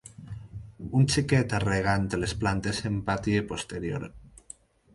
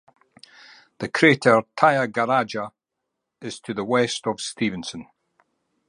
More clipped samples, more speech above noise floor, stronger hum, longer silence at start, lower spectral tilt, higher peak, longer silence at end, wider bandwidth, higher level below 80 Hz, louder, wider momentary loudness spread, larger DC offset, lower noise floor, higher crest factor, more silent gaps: neither; second, 25 dB vs 60 dB; neither; second, 0.05 s vs 1 s; about the same, -5.5 dB/octave vs -4.5 dB/octave; second, -10 dBFS vs -2 dBFS; second, 0.65 s vs 0.85 s; about the same, 11.5 kHz vs 11.5 kHz; first, -46 dBFS vs -66 dBFS; second, -27 LUFS vs -21 LUFS; about the same, 20 LU vs 18 LU; neither; second, -52 dBFS vs -81 dBFS; about the same, 18 dB vs 22 dB; neither